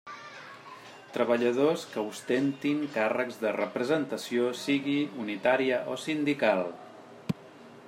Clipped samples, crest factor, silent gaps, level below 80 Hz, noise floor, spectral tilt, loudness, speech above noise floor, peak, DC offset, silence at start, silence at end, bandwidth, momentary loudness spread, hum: under 0.1%; 20 dB; none; -78 dBFS; -50 dBFS; -5 dB/octave; -29 LUFS; 22 dB; -10 dBFS; under 0.1%; 0.05 s; 0 s; 16 kHz; 18 LU; none